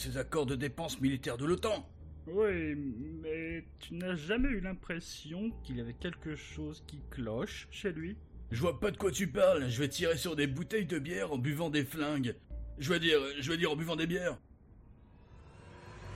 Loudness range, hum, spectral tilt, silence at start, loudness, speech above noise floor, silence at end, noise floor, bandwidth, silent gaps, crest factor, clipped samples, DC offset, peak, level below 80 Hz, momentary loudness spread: 7 LU; none; -5 dB/octave; 0 s; -35 LUFS; 23 dB; 0 s; -57 dBFS; 14.5 kHz; none; 18 dB; under 0.1%; under 0.1%; -18 dBFS; -50 dBFS; 13 LU